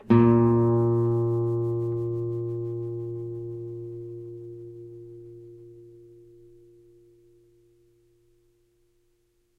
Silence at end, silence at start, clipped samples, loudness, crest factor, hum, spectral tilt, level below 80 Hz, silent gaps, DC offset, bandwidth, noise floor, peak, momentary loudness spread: 3.7 s; 0.05 s; under 0.1%; -25 LUFS; 22 dB; none; -11.5 dB/octave; -58 dBFS; none; under 0.1%; 4 kHz; -68 dBFS; -6 dBFS; 25 LU